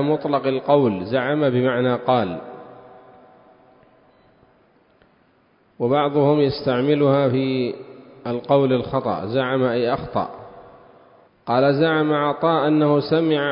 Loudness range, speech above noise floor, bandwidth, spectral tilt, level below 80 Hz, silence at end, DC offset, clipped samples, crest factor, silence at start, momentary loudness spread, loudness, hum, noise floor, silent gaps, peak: 7 LU; 40 dB; 5.4 kHz; -11.5 dB/octave; -56 dBFS; 0 s; under 0.1%; under 0.1%; 18 dB; 0 s; 11 LU; -20 LUFS; none; -59 dBFS; none; -2 dBFS